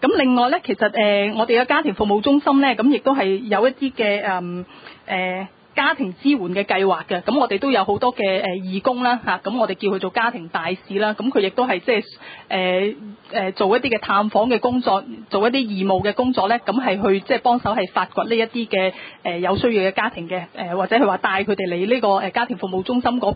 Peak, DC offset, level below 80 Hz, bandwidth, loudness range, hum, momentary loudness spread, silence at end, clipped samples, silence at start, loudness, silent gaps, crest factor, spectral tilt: -4 dBFS; under 0.1%; -54 dBFS; 5 kHz; 4 LU; none; 8 LU; 0 s; under 0.1%; 0 s; -20 LUFS; none; 16 dB; -10.5 dB/octave